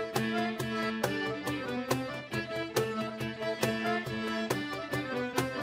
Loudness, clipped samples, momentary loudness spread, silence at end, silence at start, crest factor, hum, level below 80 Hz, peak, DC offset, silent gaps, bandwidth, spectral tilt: -33 LUFS; under 0.1%; 4 LU; 0 s; 0 s; 20 dB; none; -64 dBFS; -12 dBFS; under 0.1%; none; 16 kHz; -4.5 dB/octave